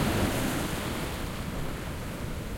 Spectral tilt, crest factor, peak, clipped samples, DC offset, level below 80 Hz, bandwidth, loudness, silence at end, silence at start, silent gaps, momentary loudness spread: -5 dB/octave; 18 dB; -14 dBFS; under 0.1%; under 0.1%; -40 dBFS; 16.5 kHz; -32 LUFS; 0 s; 0 s; none; 8 LU